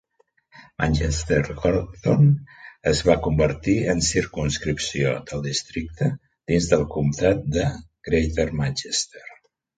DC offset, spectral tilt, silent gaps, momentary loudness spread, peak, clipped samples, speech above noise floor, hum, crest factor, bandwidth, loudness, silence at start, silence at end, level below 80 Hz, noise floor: under 0.1%; -5 dB/octave; none; 8 LU; -2 dBFS; under 0.1%; 43 dB; none; 20 dB; 9.4 kHz; -23 LUFS; 0.55 s; 0.45 s; -36 dBFS; -65 dBFS